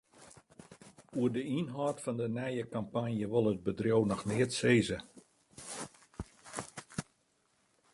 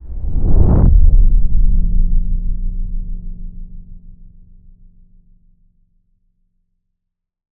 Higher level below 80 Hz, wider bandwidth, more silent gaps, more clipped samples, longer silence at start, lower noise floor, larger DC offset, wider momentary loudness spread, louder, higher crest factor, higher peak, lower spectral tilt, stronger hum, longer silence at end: second, -62 dBFS vs -16 dBFS; first, 11.5 kHz vs 1.5 kHz; neither; neither; first, 0.2 s vs 0.05 s; about the same, -74 dBFS vs -76 dBFS; neither; second, 16 LU vs 23 LU; second, -34 LUFS vs -18 LUFS; first, 22 dB vs 14 dB; second, -14 dBFS vs 0 dBFS; second, -5.5 dB/octave vs -14.5 dB/octave; neither; second, 0.9 s vs 3.45 s